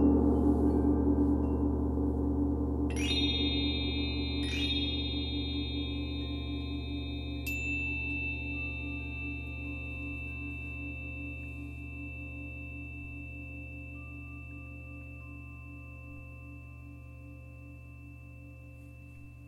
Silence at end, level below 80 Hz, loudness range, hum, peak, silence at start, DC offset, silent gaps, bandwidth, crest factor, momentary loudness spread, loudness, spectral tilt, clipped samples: 0 s; -40 dBFS; 17 LU; none; -14 dBFS; 0 s; under 0.1%; none; 14 kHz; 18 dB; 21 LU; -33 LUFS; -6 dB/octave; under 0.1%